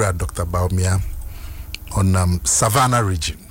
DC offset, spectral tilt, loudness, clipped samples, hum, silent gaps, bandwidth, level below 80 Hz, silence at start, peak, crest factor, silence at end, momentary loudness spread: under 0.1%; -4.5 dB/octave; -18 LUFS; under 0.1%; none; none; 17 kHz; -30 dBFS; 0 s; -6 dBFS; 14 dB; 0 s; 18 LU